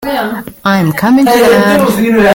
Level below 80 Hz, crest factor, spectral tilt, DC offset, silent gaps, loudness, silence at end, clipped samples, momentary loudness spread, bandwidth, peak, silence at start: -40 dBFS; 8 dB; -5.5 dB/octave; under 0.1%; none; -9 LUFS; 0 s; under 0.1%; 9 LU; 17 kHz; 0 dBFS; 0 s